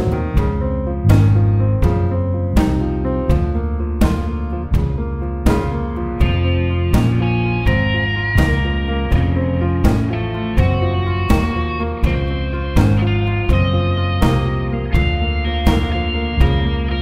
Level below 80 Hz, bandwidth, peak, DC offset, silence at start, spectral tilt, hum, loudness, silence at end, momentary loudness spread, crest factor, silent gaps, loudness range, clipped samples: -22 dBFS; 15.5 kHz; 0 dBFS; under 0.1%; 0 s; -7.5 dB/octave; none; -18 LUFS; 0 s; 5 LU; 16 dB; none; 2 LU; under 0.1%